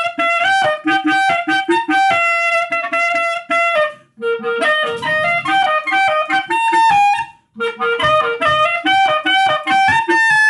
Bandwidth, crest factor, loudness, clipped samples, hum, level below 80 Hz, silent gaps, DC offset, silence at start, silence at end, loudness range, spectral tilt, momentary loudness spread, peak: 12 kHz; 10 dB; -14 LUFS; under 0.1%; none; -58 dBFS; none; under 0.1%; 0 s; 0 s; 2 LU; -3 dB/octave; 5 LU; -4 dBFS